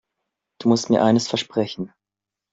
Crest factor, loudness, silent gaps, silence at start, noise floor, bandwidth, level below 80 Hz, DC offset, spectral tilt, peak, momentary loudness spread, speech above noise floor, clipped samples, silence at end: 18 dB; -20 LUFS; none; 0.6 s; -87 dBFS; 7.8 kHz; -62 dBFS; under 0.1%; -5 dB/octave; -4 dBFS; 13 LU; 67 dB; under 0.1%; 0.65 s